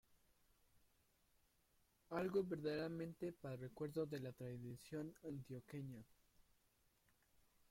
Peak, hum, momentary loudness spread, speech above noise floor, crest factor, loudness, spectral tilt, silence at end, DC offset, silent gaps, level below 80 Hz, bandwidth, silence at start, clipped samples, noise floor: -30 dBFS; none; 11 LU; 32 dB; 20 dB; -48 LUFS; -7 dB/octave; 1.65 s; under 0.1%; none; -78 dBFS; 16.5 kHz; 0.1 s; under 0.1%; -80 dBFS